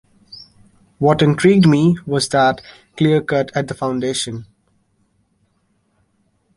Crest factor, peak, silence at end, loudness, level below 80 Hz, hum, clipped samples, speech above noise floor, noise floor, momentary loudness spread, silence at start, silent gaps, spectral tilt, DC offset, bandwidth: 16 dB; -2 dBFS; 2.15 s; -16 LUFS; -52 dBFS; none; under 0.1%; 48 dB; -64 dBFS; 22 LU; 0.35 s; none; -6 dB/octave; under 0.1%; 11.5 kHz